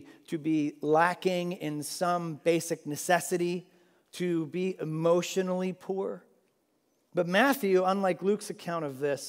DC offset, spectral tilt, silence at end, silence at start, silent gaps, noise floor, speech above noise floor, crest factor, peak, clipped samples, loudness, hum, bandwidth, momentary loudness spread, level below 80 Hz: under 0.1%; -5 dB/octave; 0 s; 0 s; none; -73 dBFS; 44 dB; 20 dB; -10 dBFS; under 0.1%; -29 LUFS; none; 16 kHz; 10 LU; -86 dBFS